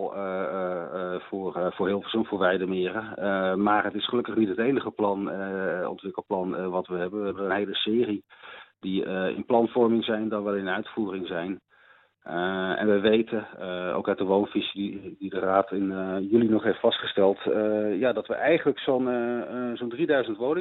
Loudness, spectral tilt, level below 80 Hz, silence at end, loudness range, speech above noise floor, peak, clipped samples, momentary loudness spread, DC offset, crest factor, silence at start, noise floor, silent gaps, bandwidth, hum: -27 LUFS; -9.5 dB/octave; -68 dBFS; 0 s; 4 LU; 33 dB; -8 dBFS; under 0.1%; 9 LU; under 0.1%; 18 dB; 0 s; -59 dBFS; none; 4.2 kHz; none